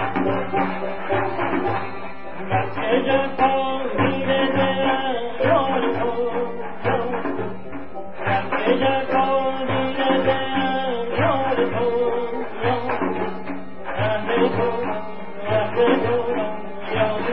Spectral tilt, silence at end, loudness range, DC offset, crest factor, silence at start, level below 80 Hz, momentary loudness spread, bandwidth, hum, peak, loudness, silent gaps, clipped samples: -10.5 dB/octave; 0 s; 3 LU; 3%; 16 dB; 0 s; -52 dBFS; 10 LU; 5.4 kHz; none; -4 dBFS; -22 LUFS; none; under 0.1%